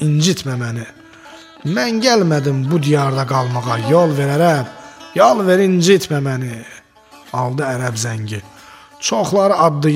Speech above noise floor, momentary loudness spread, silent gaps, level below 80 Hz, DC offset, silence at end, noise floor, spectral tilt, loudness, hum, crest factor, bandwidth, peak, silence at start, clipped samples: 29 dB; 14 LU; none; -58 dBFS; under 0.1%; 0 s; -44 dBFS; -5.5 dB/octave; -16 LUFS; none; 16 dB; 16 kHz; 0 dBFS; 0 s; under 0.1%